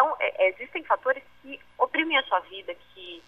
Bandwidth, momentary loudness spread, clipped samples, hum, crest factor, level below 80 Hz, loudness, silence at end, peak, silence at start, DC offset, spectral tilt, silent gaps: 5.2 kHz; 19 LU; under 0.1%; 60 Hz at -70 dBFS; 22 dB; -68 dBFS; -26 LUFS; 0.1 s; -6 dBFS; 0 s; 0.1%; -4 dB/octave; none